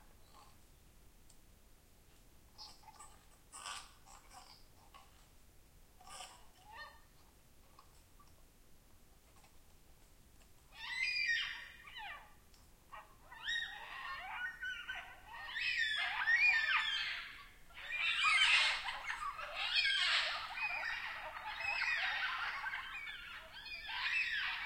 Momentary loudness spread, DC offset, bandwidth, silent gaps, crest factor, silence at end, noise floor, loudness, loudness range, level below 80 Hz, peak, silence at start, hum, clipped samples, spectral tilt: 25 LU; under 0.1%; 16.5 kHz; none; 24 dB; 0 s; -64 dBFS; -36 LUFS; 24 LU; -66 dBFS; -18 dBFS; 0 s; none; under 0.1%; 1 dB/octave